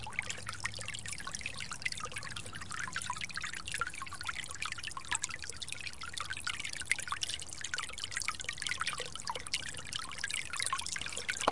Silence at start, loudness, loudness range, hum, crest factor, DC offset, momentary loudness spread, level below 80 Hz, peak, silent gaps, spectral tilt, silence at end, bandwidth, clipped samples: 0 s; -38 LUFS; 3 LU; none; 30 dB; 0.5%; 6 LU; -60 dBFS; -10 dBFS; none; -0.5 dB/octave; 0 s; 11.5 kHz; under 0.1%